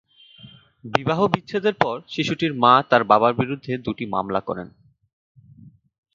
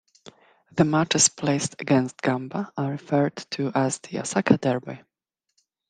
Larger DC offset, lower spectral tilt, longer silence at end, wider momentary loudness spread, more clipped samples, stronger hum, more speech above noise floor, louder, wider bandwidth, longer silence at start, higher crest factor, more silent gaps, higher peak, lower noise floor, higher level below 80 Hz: neither; first, -6.5 dB/octave vs -4 dB/octave; first, 1.5 s vs 0.9 s; about the same, 12 LU vs 11 LU; neither; neither; second, 28 dB vs 58 dB; first, -21 LUFS vs -24 LUFS; second, 7.6 kHz vs 10 kHz; first, 0.45 s vs 0.25 s; about the same, 22 dB vs 22 dB; neither; about the same, 0 dBFS vs -2 dBFS; second, -49 dBFS vs -82 dBFS; first, -58 dBFS vs -64 dBFS